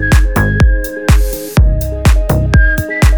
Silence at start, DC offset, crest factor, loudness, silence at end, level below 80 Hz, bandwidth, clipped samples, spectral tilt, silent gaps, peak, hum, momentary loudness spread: 0 s; 0.4%; 10 dB; -12 LUFS; 0 s; -12 dBFS; over 20 kHz; under 0.1%; -6 dB/octave; none; 0 dBFS; none; 3 LU